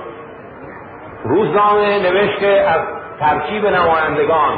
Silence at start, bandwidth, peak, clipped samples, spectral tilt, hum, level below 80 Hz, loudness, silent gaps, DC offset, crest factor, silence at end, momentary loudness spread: 0 s; 4.9 kHz; -2 dBFS; under 0.1%; -10.5 dB/octave; none; -46 dBFS; -15 LUFS; none; under 0.1%; 12 dB; 0 s; 21 LU